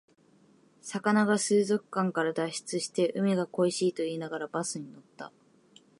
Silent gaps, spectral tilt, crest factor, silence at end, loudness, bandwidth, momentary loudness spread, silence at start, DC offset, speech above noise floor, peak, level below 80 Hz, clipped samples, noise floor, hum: none; -4.5 dB/octave; 20 dB; 0.7 s; -29 LUFS; 11.5 kHz; 21 LU; 0.85 s; under 0.1%; 33 dB; -12 dBFS; -80 dBFS; under 0.1%; -62 dBFS; none